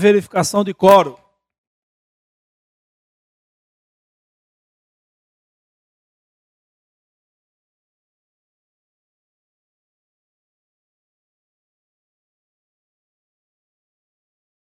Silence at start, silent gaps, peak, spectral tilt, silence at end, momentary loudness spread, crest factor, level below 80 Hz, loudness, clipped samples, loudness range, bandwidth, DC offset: 0 s; none; 0 dBFS; -5 dB/octave; 13.5 s; 8 LU; 24 dB; -66 dBFS; -14 LUFS; under 0.1%; 4 LU; 16 kHz; under 0.1%